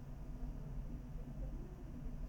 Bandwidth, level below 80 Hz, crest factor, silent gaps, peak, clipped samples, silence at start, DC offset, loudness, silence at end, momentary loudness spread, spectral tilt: 17 kHz; -48 dBFS; 12 dB; none; -34 dBFS; under 0.1%; 0 s; under 0.1%; -50 LUFS; 0 s; 2 LU; -8.5 dB/octave